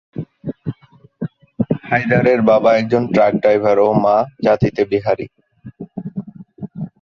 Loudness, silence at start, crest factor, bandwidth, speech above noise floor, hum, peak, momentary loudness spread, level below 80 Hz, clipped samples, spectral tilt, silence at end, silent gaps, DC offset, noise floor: -15 LUFS; 0.15 s; 16 dB; 7 kHz; 30 dB; none; -2 dBFS; 18 LU; -50 dBFS; under 0.1%; -8.5 dB/octave; 0.15 s; none; under 0.1%; -44 dBFS